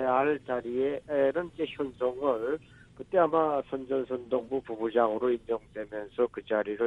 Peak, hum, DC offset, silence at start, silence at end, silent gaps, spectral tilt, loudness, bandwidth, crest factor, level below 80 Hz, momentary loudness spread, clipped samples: -10 dBFS; none; under 0.1%; 0 s; 0 s; none; -7.5 dB/octave; -30 LUFS; 7 kHz; 18 dB; -62 dBFS; 9 LU; under 0.1%